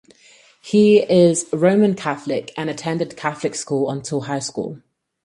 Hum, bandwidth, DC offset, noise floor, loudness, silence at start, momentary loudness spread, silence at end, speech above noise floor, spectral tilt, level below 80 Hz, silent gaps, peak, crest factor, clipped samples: none; 11.5 kHz; under 0.1%; -51 dBFS; -19 LUFS; 0.65 s; 12 LU; 0.5 s; 33 dB; -5.5 dB/octave; -62 dBFS; none; -2 dBFS; 18 dB; under 0.1%